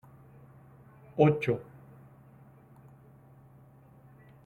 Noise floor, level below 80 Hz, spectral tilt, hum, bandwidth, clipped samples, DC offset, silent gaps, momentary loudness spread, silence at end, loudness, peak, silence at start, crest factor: -56 dBFS; -68 dBFS; -9 dB/octave; none; 6.6 kHz; under 0.1%; under 0.1%; none; 29 LU; 2.85 s; -28 LUFS; -10 dBFS; 1.15 s; 24 dB